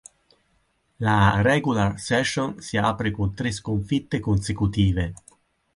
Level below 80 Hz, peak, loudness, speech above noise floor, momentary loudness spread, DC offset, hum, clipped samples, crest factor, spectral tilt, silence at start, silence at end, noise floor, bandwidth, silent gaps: -40 dBFS; -6 dBFS; -23 LUFS; 45 dB; 9 LU; under 0.1%; none; under 0.1%; 18 dB; -6 dB/octave; 1 s; 0.6 s; -67 dBFS; 11.5 kHz; none